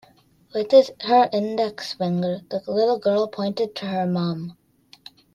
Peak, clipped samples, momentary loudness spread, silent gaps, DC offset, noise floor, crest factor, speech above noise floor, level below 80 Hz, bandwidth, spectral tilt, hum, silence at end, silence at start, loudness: -4 dBFS; under 0.1%; 12 LU; none; under 0.1%; -56 dBFS; 20 dB; 35 dB; -68 dBFS; 12.5 kHz; -7 dB/octave; none; 0.85 s; 0.55 s; -22 LUFS